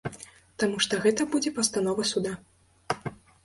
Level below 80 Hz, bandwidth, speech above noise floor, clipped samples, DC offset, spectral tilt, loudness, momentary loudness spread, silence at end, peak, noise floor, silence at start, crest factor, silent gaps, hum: -62 dBFS; 11.5 kHz; 23 dB; under 0.1%; under 0.1%; -3 dB/octave; -27 LUFS; 17 LU; 0.3 s; -8 dBFS; -49 dBFS; 0.05 s; 20 dB; none; none